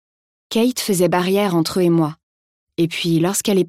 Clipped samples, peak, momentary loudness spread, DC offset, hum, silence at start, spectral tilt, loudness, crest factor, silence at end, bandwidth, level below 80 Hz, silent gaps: under 0.1%; -4 dBFS; 6 LU; 0.1%; none; 0.5 s; -5 dB/octave; -18 LUFS; 14 dB; 0 s; 16 kHz; -60 dBFS; 2.23-2.67 s